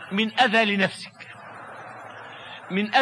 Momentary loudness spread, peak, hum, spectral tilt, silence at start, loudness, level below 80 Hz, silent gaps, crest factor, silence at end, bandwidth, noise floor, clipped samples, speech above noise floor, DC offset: 21 LU; -6 dBFS; none; -4.5 dB/octave; 0 s; -22 LUFS; -74 dBFS; none; 20 dB; 0 s; 11 kHz; -42 dBFS; under 0.1%; 20 dB; under 0.1%